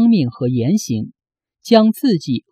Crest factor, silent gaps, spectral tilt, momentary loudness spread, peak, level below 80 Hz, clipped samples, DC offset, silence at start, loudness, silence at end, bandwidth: 16 dB; none; -6.5 dB/octave; 12 LU; 0 dBFS; -58 dBFS; under 0.1%; under 0.1%; 0 s; -16 LUFS; 0.15 s; 15 kHz